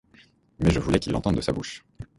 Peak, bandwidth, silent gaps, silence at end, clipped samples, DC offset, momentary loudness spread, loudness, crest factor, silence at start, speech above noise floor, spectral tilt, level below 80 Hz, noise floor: -6 dBFS; 11.5 kHz; none; 0.15 s; under 0.1%; under 0.1%; 12 LU; -25 LUFS; 20 dB; 0.6 s; 33 dB; -6.5 dB/octave; -38 dBFS; -57 dBFS